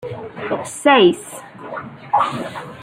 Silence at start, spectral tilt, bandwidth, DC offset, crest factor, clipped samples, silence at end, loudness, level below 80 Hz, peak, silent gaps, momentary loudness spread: 0 s; -4.5 dB/octave; 15.5 kHz; under 0.1%; 18 dB; under 0.1%; 0 s; -17 LUFS; -62 dBFS; -2 dBFS; none; 19 LU